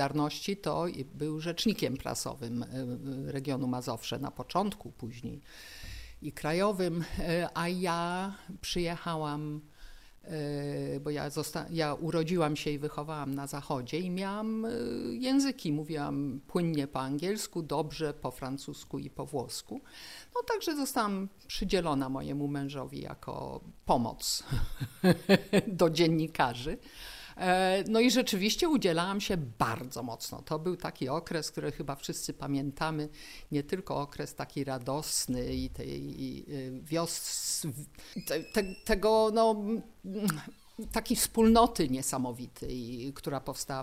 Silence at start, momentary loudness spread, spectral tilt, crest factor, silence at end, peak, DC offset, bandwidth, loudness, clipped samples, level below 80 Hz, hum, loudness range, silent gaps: 0 s; 14 LU; -4.5 dB/octave; 24 dB; 0 s; -10 dBFS; under 0.1%; 16 kHz; -32 LUFS; under 0.1%; -50 dBFS; none; 7 LU; none